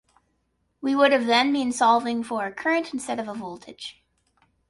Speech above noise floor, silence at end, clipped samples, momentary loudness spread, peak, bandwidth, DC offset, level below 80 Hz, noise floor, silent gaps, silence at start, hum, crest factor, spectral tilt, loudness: 49 dB; 0.8 s; under 0.1%; 18 LU; -6 dBFS; 11.5 kHz; under 0.1%; -68 dBFS; -72 dBFS; none; 0.8 s; none; 18 dB; -3 dB/octave; -23 LUFS